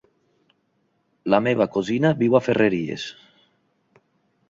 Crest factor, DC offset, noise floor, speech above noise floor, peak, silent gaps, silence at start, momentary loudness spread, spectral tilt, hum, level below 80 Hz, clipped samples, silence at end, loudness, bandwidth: 20 dB; under 0.1%; -69 dBFS; 49 dB; -4 dBFS; none; 1.25 s; 14 LU; -7 dB/octave; none; -62 dBFS; under 0.1%; 1.35 s; -21 LUFS; 7.8 kHz